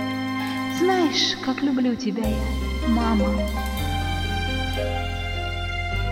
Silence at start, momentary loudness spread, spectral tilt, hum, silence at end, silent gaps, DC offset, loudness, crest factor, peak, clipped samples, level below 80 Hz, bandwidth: 0 s; 7 LU; -5 dB/octave; none; 0 s; none; under 0.1%; -24 LUFS; 14 dB; -8 dBFS; under 0.1%; -30 dBFS; 16.5 kHz